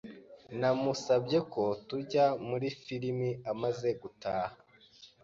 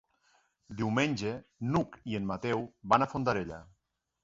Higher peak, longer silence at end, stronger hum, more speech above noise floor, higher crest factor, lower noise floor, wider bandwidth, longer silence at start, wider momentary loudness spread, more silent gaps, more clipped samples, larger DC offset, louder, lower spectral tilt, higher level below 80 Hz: second, -16 dBFS vs -10 dBFS; second, 0.2 s vs 0.6 s; neither; second, 27 dB vs 39 dB; second, 18 dB vs 24 dB; second, -59 dBFS vs -71 dBFS; about the same, 7.6 kHz vs 8 kHz; second, 0.05 s vs 0.7 s; about the same, 10 LU vs 10 LU; neither; neither; neither; about the same, -33 LUFS vs -32 LUFS; about the same, -6 dB/octave vs -6.5 dB/octave; second, -70 dBFS vs -60 dBFS